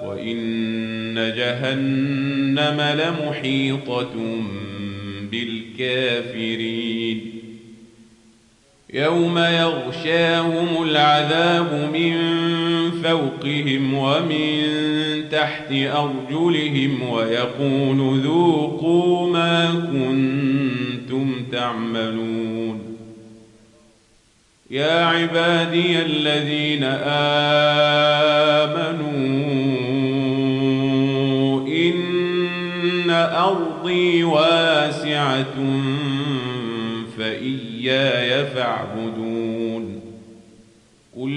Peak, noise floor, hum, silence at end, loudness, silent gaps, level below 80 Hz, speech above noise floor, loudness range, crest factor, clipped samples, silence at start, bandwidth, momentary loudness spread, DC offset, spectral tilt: -4 dBFS; -57 dBFS; none; 0 s; -20 LUFS; none; -64 dBFS; 38 dB; 7 LU; 16 dB; under 0.1%; 0 s; 10.5 kHz; 10 LU; under 0.1%; -6 dB/octave